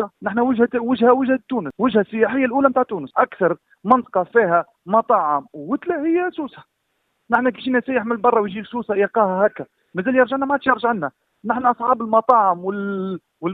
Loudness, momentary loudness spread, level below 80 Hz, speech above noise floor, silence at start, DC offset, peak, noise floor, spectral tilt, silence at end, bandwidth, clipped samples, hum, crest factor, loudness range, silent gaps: -19 LUFS; 10 LU; -62 dBFS; 52 dB; 0 s; under 0.1%; 0 dBFS; -71 dBFS; -9 dB/octave; 0 s; 4.5 kHz; under 0.1%; none; 20 dB; 3 LU; none